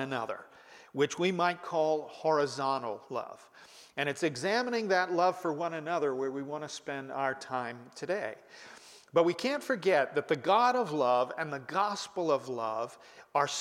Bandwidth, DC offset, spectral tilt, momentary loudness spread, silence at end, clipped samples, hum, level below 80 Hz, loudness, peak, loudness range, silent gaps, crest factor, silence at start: 15.5 kHz; under 0.1%; -4.5 dB/octave; 13 LU; 0 s; under 0.1%; none; -80 dBFS; -31 LUFS; -14 dBFS; 5 LU; none; 18 dB; 0 s